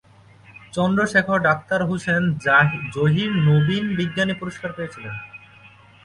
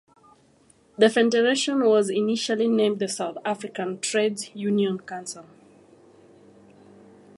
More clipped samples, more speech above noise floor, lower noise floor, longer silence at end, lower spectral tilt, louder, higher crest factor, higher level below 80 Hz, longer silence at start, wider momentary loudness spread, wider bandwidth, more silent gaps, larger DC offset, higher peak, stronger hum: neither; second, 29 dB vs 36 dB; second, -49 dBFS vs -59 dBFS; second, 0.65 s vs 1.95 s; first, -6.5 dB/octave vs -4 dB/octave; first, -20 LUFS vs -23 LUFS; about the same, 18 dB vs 20 dB; first, -54 dBFS vs -74 dBFS; second, 0.5 s vs 1 s; about the same, 15 LU vs 13 LU; about the same, 11 kHz vs 11.5 kHz; neither; neither; first, -2 dBFS vs -6 dBFS; neither